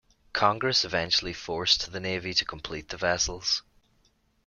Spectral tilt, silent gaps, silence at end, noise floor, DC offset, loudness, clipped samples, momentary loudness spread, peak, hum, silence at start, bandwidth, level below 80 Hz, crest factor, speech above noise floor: -2 dB/octave; none; 0.85 s; -67 dBFS; under 0.1%; -26 LUFS; under 0.1%; 10 LU; -6 dBFS; none; 0.35 s; 12 kHz; -52 dBFS; 22 dB; 39 dB